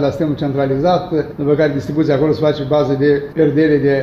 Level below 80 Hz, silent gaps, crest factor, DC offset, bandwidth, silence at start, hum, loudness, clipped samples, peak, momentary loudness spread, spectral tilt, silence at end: -44 dBFS; none; 12 dB; under 0.1%; 7.2 kHz; 0 s; none; -15 LUFS; under 0.1%; -2 dBFS; 5 LU; -8.5 dB/octave; 0 s